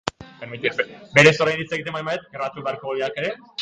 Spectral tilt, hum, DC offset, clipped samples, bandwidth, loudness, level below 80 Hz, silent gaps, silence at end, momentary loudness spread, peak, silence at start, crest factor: -4.5 dB/octave; none; under 0.1%; under 0.1%; 9.4 kHz; -21 LUFS; -58 dBFS; none; 0 s; 16 LU; 0 dBFS; 0.05 s; 22 dB